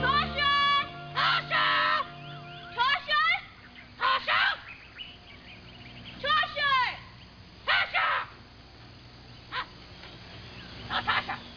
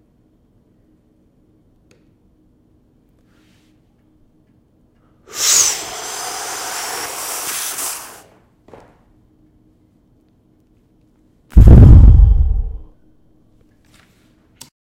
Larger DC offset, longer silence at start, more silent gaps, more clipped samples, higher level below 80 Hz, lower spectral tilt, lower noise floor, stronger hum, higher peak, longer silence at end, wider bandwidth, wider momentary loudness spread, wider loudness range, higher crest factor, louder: neither; second, 0 s vs 5.35 s; neither; second, under 0.1% vs 0.8%; second, -54 dBFS vs -18 dBFS; about the same, -4 dB/octave vs -4.5 dB/octave; second, -50 dBFS vs -55 dBFS; neither; second, -12 dBFS vs 0 dBFS; second, 0 s vs 2.2 s; second, 5.4 kHz vs 16 kHz; about the same, 22 LU vs 20 LU; second, 6 LU vs 14 LU; about the same, 18 dB vs 16 dB; second, -26 LUFS vs -13 LUFS